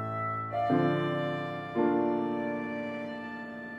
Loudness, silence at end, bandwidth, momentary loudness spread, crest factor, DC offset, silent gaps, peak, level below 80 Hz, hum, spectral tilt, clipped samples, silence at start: -31 LUFS; 0 s; 7.6 kHz; 11 LU; 16 dB; under 0.1%; none; -14 dBFS; -68 dBFS; none; -8.5 dB/octave; under 0.1%; 0 s